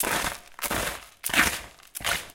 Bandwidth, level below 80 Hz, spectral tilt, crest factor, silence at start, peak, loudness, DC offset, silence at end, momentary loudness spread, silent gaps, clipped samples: 17 kHz; -46 dBFS; -1.5 dB/octave; 24 dB; 0 s; -6 dBFS; -27 LUFS; under 0.1%; 0 s; 11 LU; none; under 0.1%